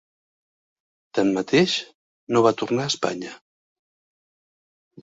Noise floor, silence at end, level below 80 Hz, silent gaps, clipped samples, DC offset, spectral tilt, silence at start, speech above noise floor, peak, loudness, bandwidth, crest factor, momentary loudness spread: under -90 dBFS; 1.65 s; -66 dBFS; 1.94-2.27 s; under 0.1%; under 0.1%; -4.5 dB/octave; 1.15 s; over 69 dB; -4 dBFS; -22 LUFS; 8 kHz; 22 dB; 10 LU